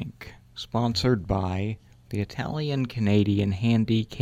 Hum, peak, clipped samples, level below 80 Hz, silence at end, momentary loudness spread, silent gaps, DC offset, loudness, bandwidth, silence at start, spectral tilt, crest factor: none; -8 dBFS; under 0.1%; -46 dBFS; 0 s; 16 LU; none; under 0.1%; -26 LUFS; 14 kHz; 0 s; -7 dB/octave; 16 dB